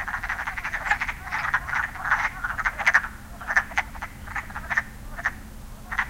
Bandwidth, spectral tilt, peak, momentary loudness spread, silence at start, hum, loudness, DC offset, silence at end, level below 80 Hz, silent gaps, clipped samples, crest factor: 17 kHz; -3 dB/octave; -4 dBFS; 14 LU; 0 s; none; -26 LUFS; under 0.1%; 0 s; -42 dBFS; none; under 0.1%; 24 dB